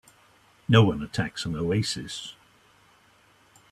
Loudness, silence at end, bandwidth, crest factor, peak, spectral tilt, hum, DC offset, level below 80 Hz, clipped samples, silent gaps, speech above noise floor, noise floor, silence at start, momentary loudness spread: -25 LUFS; 1.4 s; 12.5 kHz; 24 dB; -4 dBFS; -5.5 dB/octave; none; under 0.1%; -54 dBFS; under 0.1%; none; 35 dB; -60 dBFS; 0.7 s; 17 LU